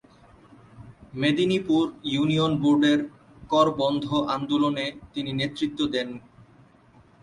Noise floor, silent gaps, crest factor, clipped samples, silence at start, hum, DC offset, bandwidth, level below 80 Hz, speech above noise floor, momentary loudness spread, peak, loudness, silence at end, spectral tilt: -55 dBFS; none; 18 dB; under 0.1%; 0.75 s; none; under 0.1%; 10.5 kHz; -58 dBFS; 32 dB; 10 LU; -8 dBFS; -24 LUFS; 1.05 s; -6 dB/octave